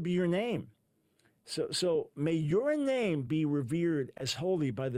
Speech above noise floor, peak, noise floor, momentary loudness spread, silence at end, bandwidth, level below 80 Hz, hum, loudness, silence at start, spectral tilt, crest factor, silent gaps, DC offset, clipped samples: 41 dB; -18 dBFS; -72 dBFS; 6 LU; 0 s; 16 kHz; -66 dBFS; none; -32 LUFS; 0 s; -6 dB/octave; 14 dB; none; under 0.1%; under 0.1%